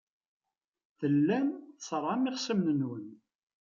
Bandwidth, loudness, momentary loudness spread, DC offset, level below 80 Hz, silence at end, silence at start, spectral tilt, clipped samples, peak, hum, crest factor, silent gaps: 7.4 kHz; -31 LUFS; 14 LU; under 0.1%; -78 dBFS; 0.45 s; 1 s; -6 dB/octave; under 0.1%; -18 dBFS; none; 14 dB; none